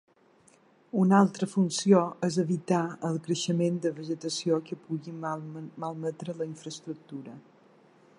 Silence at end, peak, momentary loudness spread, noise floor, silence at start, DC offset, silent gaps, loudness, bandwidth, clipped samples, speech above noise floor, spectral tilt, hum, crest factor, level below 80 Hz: 0.8 s; -8 dBFS; 17 LU; -62 dBFS; 0.95 s; under 0.1%; none; -29 LUFS; 11 kHz; under 0.1%; 33 dB; -6 dB/octave; none; 22 dB; -78 dBFS